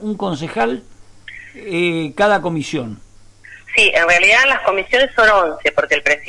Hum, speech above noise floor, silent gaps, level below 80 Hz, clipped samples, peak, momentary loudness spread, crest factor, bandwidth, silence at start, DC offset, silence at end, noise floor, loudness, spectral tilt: none; 26 dB; none; -44 dBFS; under 0.1%; -2 dBFS; 15 LU; 14 dB; 11.5 kHz; 0 s; under 0.1%; 0 s; -41 dBFS; -14 LUFS; -3.5 dB/octave